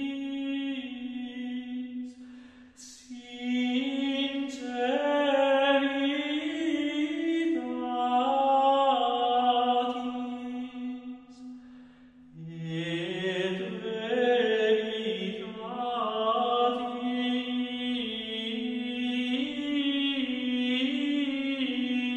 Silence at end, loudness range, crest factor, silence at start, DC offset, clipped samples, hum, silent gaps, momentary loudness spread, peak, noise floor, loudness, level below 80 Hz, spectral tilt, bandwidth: 0 s; 9 LU; 16 dB; 0 s; under 0.1%; under 0.1%; none; none; 14 LU; -12 dBFS; -53 dBFS; -29 LUFS; -70 dBFS; -5 dB/octave; 9 kHz